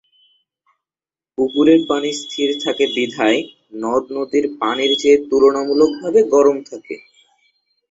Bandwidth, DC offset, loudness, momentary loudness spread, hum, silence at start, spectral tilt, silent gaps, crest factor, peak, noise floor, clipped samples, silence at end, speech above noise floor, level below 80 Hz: 8 kHz; under 0.1%; -16 LUFS; 14 LU; none; 1.4 s; -4 dB/octave; none; 16 dB; -2 dBFS; under -90 dBFS; under 0.1%; 0.95 s; over 74 dB; -58 dBFS